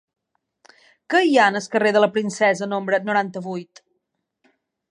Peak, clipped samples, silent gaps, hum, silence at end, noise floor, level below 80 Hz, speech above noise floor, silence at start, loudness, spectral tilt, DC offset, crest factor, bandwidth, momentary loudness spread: -4 dBFS; under 0.1%; none; none; 1.3 s; -76 dBFS; -76 dBFS; 56 dB; 1.1 s; -19 LUFS; -4.5 dB/octave; under 0.1%; 18 dB; 11 kHz; 12 LU